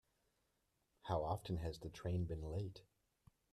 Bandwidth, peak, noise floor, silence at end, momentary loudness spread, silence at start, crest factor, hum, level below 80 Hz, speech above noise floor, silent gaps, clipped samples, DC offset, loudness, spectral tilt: 13 kHz; -26 dBFS; -84 dBFS; 0.7 s; 10 LU; 1.05 s; 20 dB; none; -60 dBFS; 41 dB; none; under 0.1%; under 0.1%; -45 LUFS; -7.5 dB/octave